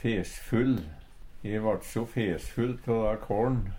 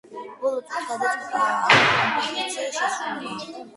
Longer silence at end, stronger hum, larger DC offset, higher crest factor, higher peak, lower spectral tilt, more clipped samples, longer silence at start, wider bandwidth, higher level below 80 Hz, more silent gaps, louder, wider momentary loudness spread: about the same, 0 s vs 0 s; neither; neither; second, 16 dB vs 24 dB; second, -14 dBFS vs 0 dBFS; first, -7 dB/octave vs -2.5 dB/octave; neither; about the same, 0 s vs 0.1 s; first, 16.5 kHz vs 11.5 kHz; first, -42 dBFS vs -66 dBFS; neither; second, -30 LUFS vs -22 LUFS; second, 6 LU vs 15 LU